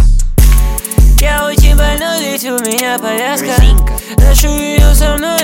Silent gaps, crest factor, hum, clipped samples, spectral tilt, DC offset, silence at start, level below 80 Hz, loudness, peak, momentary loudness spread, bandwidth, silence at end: none; 8 dB; none; under 0.1%; -4.5 dB/octave; under 0.1%; 0 s; -10 dBFS; -11 LUFS; 0 dBFS; 5 LU; 17.5 kHz; 0 s